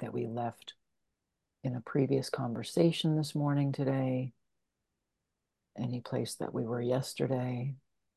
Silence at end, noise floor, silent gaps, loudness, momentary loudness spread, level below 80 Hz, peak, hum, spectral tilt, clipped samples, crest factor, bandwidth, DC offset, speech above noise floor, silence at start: 0.4 s; -86 dBFS; none; -33 LUFS; 12 LU; -74 dBFS; -14 dBFS; none; -6.5 dB/octave; under 0.1%; 20 dB; 12.5 kHz; under 0.1%; 53 dB; 0 s